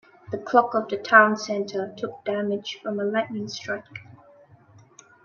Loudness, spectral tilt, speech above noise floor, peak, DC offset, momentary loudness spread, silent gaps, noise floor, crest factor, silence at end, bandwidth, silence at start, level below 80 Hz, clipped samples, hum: -24 LUFS; -4.5 dB/octave; 30 dB; -2 dBFS; under 0.1%; 17 LU; none; -53 dBFS; 24 dB; 1.25 s; 7.2 kHz; 0.3 s; -72 dBFS; under 0.1%; none